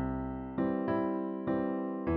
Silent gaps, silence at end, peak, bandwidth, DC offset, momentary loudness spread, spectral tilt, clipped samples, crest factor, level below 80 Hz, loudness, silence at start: none; 0 s; -20 dBFS; 4.7 kHz; under 0.1%; 5 LU; -8 dB/octave; under 0.1%; 12 dB; -50 dBFS; -34 LUFS; 0 s